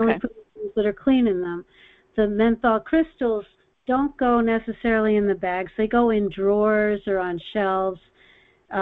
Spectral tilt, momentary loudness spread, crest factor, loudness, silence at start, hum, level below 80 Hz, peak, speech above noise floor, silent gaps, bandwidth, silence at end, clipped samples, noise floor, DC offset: -9.5 dB/octave; 10 LU; 16 dB; -22 LUFS; 0 s; none; -48 dBFS; -6 dBFS; 34 dB; none; 4.3 kHz; 0 s; under 0.1%; -56 dBFS; under 0.1%